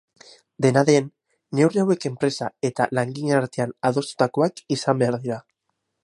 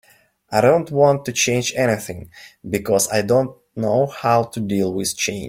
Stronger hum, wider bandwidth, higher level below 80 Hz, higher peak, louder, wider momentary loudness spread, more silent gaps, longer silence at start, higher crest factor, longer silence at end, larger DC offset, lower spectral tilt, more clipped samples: neither; second, 11.5 kHz vs 16.5 kHz; second, -66 dBFS vs -54 dBFS; about the same, -4 dBFS vs -2 dBFS; second, -22 LUFS vs -19 LUFS; about the same, 8 LU vs 10 LU; neither; about the same, 0.6 s vs 0.5 s; about the same, 20 dB vs 16 dB; first, 0.65 s vs 0 s; neither; first, -6 dB/octave vs -4.5 dB/octave; neither